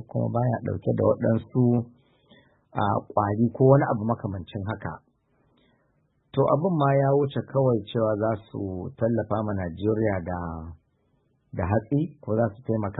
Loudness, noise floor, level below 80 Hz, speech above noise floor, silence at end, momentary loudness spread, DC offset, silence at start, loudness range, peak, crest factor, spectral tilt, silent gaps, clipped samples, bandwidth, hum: -25 LUFS; -68 dBFS; -54 dBFS; 44 dB; 0 s; 12 LU; under 0.1%; 0 s; 4 LU; -4 dBFS; 22 dB; -12.5 dB/octave; none; under 0.1%; 4 kHz; none